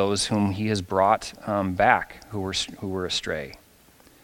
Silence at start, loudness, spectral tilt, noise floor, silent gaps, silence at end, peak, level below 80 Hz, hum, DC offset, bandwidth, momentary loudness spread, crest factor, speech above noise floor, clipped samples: 0 s; -25 LUFS; -4.5 dB/octave; -55 dBFS; none; 0.65 s; -2 dBFS; -54 dBFS; none; under 0.1%; 17 kHz; 12 LU; 24 dB; 30 dB; under 0.1%